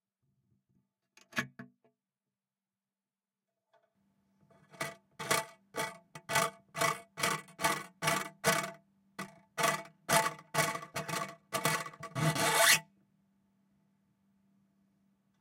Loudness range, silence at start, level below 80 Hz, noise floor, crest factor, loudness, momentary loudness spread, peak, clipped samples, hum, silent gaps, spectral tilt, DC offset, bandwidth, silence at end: 16 LU; 1.35 s; -76 dBFS; under -90 dBFS; 26 dB; -32 LUFS; 15 LU; -10 dBFS; under 0.1%; none; none; -2 dB/octave; under 0.1%; 17 kHz; 2.55 s